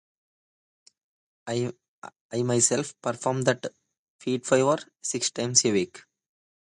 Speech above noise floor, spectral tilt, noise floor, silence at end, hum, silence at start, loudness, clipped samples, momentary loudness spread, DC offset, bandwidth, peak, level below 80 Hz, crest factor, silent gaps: over 64 dB; -3.5 dB/octave; under -90 dBFS; 0.7 s; none; 1.45 s; -26 LUFS; under 0.1%; 14 LU; under 0.1%; 11.5 kHz; -6 dBFS; -68 dBFS; 22 dB; 1.88-2.02 s, 2.16-2.29 s, 3.98-4.19 s